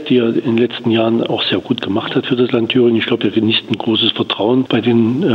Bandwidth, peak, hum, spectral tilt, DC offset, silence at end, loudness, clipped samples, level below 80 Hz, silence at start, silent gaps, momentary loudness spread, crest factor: 6.4 kHz; 0 dBFS; none; -7.5 dB/octave; under 0.1%; 0 s; -15 LUFS; under 0.1%; -60 dBFS; 0 s; none; 4 LU; 14 dB